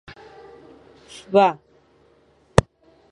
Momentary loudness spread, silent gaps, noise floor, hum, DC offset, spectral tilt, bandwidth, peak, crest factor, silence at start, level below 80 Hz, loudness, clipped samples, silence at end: 26 LU; none; -58 dBFS; none; under 0.1%; -6 dB/octave; 11.5 kHz; 0 dBFS; 24 dB; 1.3 s; -40 dBFS; -20 LUFS; under 0.1%; 1.6 s